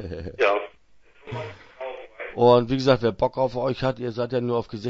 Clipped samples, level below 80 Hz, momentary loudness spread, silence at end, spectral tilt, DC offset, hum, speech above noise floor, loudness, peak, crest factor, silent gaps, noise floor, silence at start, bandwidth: under 0.1%; -50 dBFS; 19 LU; 0 s; -7 dB/octave; under 0.1%; none; 31 dB; -22 LUFS; -4 dBFS; 20 dB; none; -53 dBFS; 0 s; 7.6 kHz